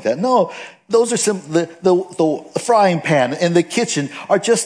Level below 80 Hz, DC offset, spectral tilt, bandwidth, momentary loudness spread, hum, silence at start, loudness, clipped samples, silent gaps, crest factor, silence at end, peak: -72 dBFS; under 0.1%; -4.5 dB/octave; 10.5 kHz; 6 LU; none; 0 s; -17 LUFS; under 0.1%; none; 16 dB; 0 s; 0 dBFS